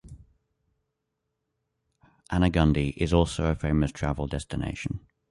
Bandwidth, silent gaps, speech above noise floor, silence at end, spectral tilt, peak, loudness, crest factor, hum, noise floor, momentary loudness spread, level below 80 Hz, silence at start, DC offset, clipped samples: 11.5 kHz; none; 56 dB; 0.3 s; -7 dB/octave; -8 dBFS; -27 LUFS; 20 dB; none; -81 dBFS; 10 LU; -38 dBFS; 0.05 s; under 0.1%; under 0.1%